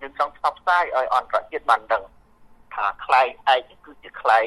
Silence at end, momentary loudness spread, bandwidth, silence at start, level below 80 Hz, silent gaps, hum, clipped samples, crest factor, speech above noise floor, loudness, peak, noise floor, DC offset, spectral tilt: 0 s; 7 LU; 12 kHz; 0 s; -58 dBFS; none; none; under 0.1%; 20 dB; 30 dB; -22 LUFS; -2 dBFS; -51 dBFS; under 0.1%; -2 dB/octave